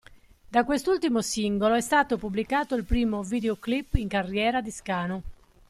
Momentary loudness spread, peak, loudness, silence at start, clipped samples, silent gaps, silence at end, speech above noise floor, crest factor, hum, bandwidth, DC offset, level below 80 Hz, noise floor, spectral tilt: 6 LU; -6 dBFS; -26 LUFS; 0.1 s; under 0.1%; none; 0.35 s; 26 dB; 20 dB; none; 14 kHz; under 0.1%; -40 dBFS; -52 dBFS; -5 dB/octave